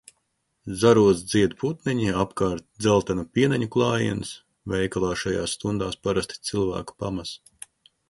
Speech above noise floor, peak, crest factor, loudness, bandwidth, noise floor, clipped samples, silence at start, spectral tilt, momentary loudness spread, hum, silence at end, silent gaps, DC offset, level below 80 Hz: 50 dB; -6 dBFS; 20 dB; -24 LUFS; 11.5 kHz; -74 dBFS; under 0.1%; 0.65 s; -5.5 dB/octave; 17 LU; none; 0.75 s; none; under 0.1%; -48 dBFS